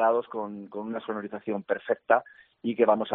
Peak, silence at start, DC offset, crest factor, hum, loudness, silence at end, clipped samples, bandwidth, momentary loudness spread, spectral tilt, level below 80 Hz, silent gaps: -6 dBFS; 0 s; under 0.1%; 22 dB; none; -29 LUFS; 0 s; under 0.1%; 4 kHz; 12 LU; -4 dB/octave; -76 dBFS; none